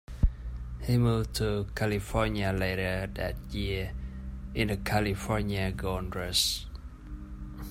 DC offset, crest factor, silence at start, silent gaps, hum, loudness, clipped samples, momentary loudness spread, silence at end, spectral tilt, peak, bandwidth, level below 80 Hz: under 0.1%; 20 dB; 0.1 s; none; none; -31 LUFS; under 0.1%; 16 LU; 0 s; -5 dB/octave; -12 dBFS; 16 kHz; -38 dBFS